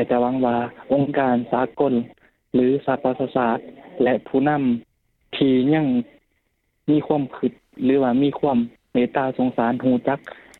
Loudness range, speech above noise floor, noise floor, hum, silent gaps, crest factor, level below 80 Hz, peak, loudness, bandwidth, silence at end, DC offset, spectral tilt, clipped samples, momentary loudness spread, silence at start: 1 LU; 50 dB; -70 dBFS; none; none; 16 dB; -58 dBFS; -6 dBFS; -21 LUFS; 4.2 kHz; 0.25 s; under 0.1%; -9 dB/octave; under 0.1%; 8 LU; 0 s